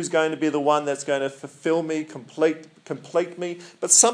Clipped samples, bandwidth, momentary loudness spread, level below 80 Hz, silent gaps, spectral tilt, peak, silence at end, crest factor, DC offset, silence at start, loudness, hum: under 0.1%; 10.5 kHz; 13 LU; -84 dBFS; none; -2.5 dB/octave; -2 dBFS; 0 s; 22 dB; under 0.1%; 0 s; -23 LUFS; none